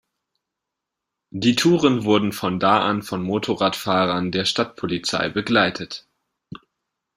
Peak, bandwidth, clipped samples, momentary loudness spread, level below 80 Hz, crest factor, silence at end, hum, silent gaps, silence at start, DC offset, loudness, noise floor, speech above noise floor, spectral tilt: -2 dBFS; 15.5 kHz; under 0.1%; 8 LU; -58 dBFS; 20 dB; 0.6 s; none; none; 1.35 s; under 0.1%; -20 LUFS; -83 dBFS; 63 dB; -5 dB/octave